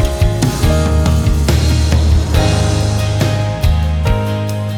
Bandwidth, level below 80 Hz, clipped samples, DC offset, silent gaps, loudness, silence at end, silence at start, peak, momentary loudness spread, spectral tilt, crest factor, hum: 16.5 kHz; -18 dBFS; under 0.1%; under 0.1%; none; -14 LUFS; 0 s; 0 s; 0 dBFS; 3 LU; -6 dB/octave; 12 dB; none